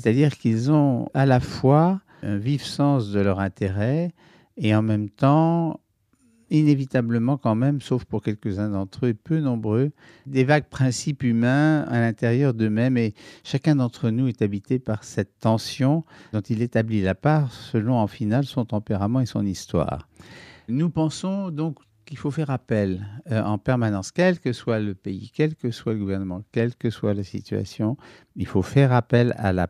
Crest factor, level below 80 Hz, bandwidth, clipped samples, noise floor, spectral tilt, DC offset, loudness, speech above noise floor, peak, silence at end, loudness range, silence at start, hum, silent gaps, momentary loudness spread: 20 dB; -54 dBFS; 11.5 kHz; under 0.1%; -63 dBFS; -7.5 dB/octave; under 0.1%; -23 LUFS; 41 dB; -2 dBFS; 0 s; 5 LU; 0 s; none; none; 10 LU